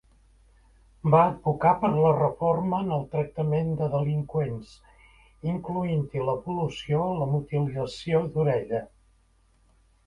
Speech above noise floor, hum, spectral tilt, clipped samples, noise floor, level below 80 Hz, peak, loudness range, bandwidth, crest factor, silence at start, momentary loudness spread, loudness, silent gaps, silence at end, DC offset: 38 dB; none; -8.5 dB/octave; under 0.1%; -63 dBFS; -54 dBFS; -6 dBFS; 5 LU; 9.8 kHz; 20 dB; 1.05 s; 10 LU; -26 LUFS; none; 1.2 s; under 0.1%